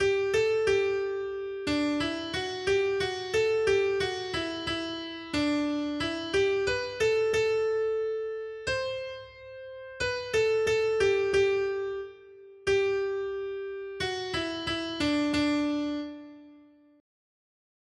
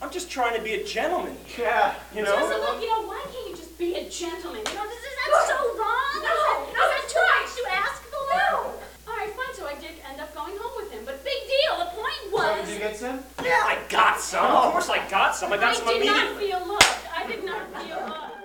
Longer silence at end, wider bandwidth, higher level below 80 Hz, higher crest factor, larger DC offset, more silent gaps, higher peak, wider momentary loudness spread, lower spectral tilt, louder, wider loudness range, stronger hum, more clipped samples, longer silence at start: first, 1.4 s vs 0 s; second, 11.5 kHz vs over 20 kHz; about the same, -56 dBFS vs -52 dBFS; second, 14 dB vs 26 dB; neither; neither; second, -14 dBFS vs 0 dBFS; second, 11 LU vs 14 LU; first, -4 dB/octave vs -1.5 dB/octave; second, -29 LUFS vs -24 LUFS; second, 3 LU vs 7 LU; neither; neither; about the same, 0 s vs 0 s